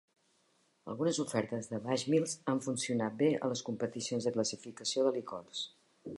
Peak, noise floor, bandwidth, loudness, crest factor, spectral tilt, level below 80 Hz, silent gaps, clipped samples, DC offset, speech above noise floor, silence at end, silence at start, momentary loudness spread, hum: -18 dBFS; -73 dBFS; 11.5 kHz; -35 LUFS; 18 dB; -4.5 dB/octave; -78 dBFS; none; under 0.1%; under 0.1%; 39 dB; 0 s; 0.85 s; 10 LU; none